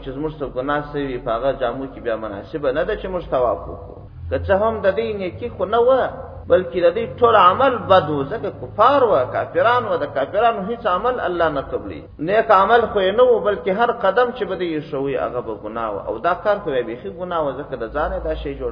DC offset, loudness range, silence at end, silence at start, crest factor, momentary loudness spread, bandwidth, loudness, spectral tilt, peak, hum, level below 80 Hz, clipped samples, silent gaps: under 0.1%; 7 LU; 0 s; 0 s; 18 dB; 13 LU; 5.4 kHz; -19 LUFS; -8 dB/octave; 0 dBFS; none; -42 dBFS; under 0.1%; none